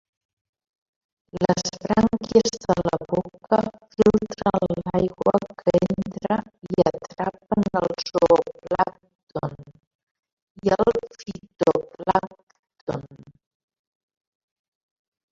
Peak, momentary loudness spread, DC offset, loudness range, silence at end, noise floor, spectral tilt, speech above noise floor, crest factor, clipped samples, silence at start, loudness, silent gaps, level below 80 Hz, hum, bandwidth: -2 dBFS; 13 LU; under 0.1%; 6 LU; 2.15 s; -42 dBFS; -6 dB/octave; 21 dB; 22 dB; under 0.1%; 1.35 s; -23 LUFS; 9.15-9.27 s, 9.87-10.23 s, 10.32-10.55 s, 12.43-12.47 s, 12.59-12.63 s, 12.81-12.87 s; -52 dBFS; none; 7.8 kHz